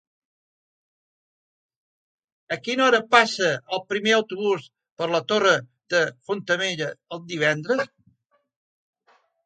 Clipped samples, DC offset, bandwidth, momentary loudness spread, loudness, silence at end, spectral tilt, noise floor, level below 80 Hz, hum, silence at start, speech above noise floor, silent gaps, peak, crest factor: under 0.1%; under 0.1%; 9.2 kHz; 13 LU; -23 LUFS; 1.6 s; -3.5 dB/octave; -66 dBFS; -74 dBFS; none; 2.5 s; 44 dB; 4.92-4.96 s; -2 dBFS; 24 dB